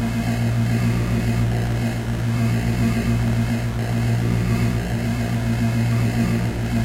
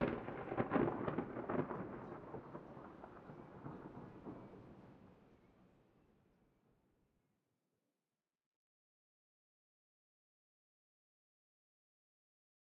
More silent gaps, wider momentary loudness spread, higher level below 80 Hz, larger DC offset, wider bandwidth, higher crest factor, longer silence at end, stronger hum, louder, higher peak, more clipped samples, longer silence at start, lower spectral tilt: neither; second, 3 LU vs 21 LU; first, -32 dBFS vs -72 dBFS; neither; first, 15.5 kHz vs 6 kHz; second, 12 dB vs 26 dB; second, 0 s vs 6.95 s; neither; first, -21 LUFS vs -44 LUFS; first, -8 dBFS vs -22 dBFS; neither; about the same, 0 s vs 0 s; about the same, -7 dB/octave vs -7 dB/octave